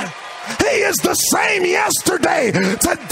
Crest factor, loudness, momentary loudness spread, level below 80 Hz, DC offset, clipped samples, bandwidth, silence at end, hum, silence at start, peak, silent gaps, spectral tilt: 18 dB; -16 LUFS; 7 LU; -46 dBFS; under 0.1%; under 0.1%; 16.5 kHz; 0 s; none; 0 s; 0 dBFS; none; -2.5 dB/octave